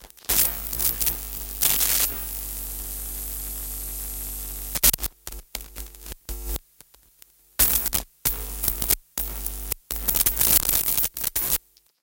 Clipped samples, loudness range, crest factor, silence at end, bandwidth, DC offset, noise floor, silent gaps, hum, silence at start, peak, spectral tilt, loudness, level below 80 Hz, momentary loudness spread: under 0.1%; 5 LU; 24 dB; 0.45 s; 18 kHz; under 0.1%; -55 dBFS; none; none; 0 s; -2 dBFS; -1 dB/octave; -23 LUFS; -38 dBFS; 17 LU